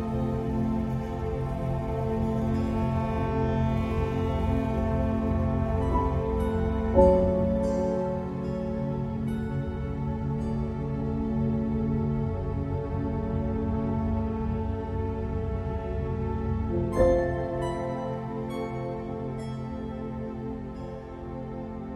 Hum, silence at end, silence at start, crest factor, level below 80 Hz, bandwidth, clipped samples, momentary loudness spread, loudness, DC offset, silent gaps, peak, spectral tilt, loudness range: none; 0 s; 0 s; 20 dB; -36 dBFS; 10.5 kHz; under 0.1%; 9 LU; -29 LUFS; under 0.1%; none; -8 dBFS; -9.5 dB/octave; 6 LU